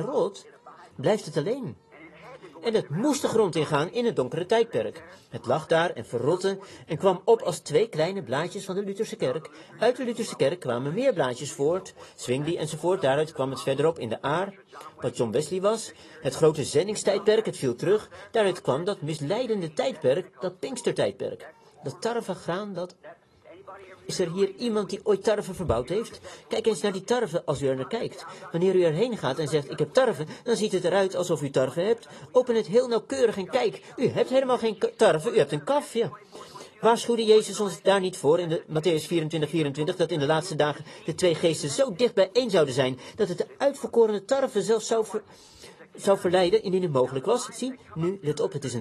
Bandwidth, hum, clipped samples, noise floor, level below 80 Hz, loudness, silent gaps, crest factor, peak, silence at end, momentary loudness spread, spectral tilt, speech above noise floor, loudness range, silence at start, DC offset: 12.5 kHz; none; under 0.1%; -51 dBFS; -60 dBFS; -26 LUFS; none; 18 dB; -8 dBFS; 0 s; 11 LU; -5 dB/octave; 26 dB; 4 LU; 0 s; under 0.1%